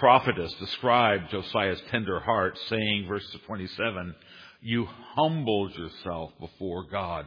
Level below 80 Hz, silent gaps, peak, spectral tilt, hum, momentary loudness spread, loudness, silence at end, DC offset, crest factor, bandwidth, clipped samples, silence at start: -56 dBFS; none; -6 dBFS; -7.5 dB/octave; none; 15 LU; -28 LUFS; 0 s; under 0.1%; 22 dB; 5.2 kHz; under 0.1%; 0 s